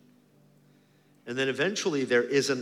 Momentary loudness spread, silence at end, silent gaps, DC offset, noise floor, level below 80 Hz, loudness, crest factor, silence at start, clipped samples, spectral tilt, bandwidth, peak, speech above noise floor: 10 LU; 0 s; none; under 0.1%; -62 dBFS; -80 dBFS; -27 LUFS; 18 dB; 1.25 s; under 0.1%; -3.5 dB/octave; 14.5 kHz; -12 dBFS; 35 dB